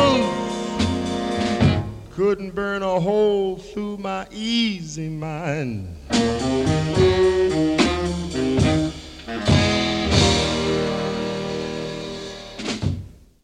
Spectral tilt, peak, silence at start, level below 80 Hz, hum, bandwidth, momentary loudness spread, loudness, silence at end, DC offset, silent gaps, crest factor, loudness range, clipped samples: -5.5 dB/octave; -2 dBFS; 0 s; -40 dBFS; none; 12 kHz; 12 LU; -22 LUFS; 0.3 s; under 0.1%; none; 20 dB; 4 LU; under 0.1%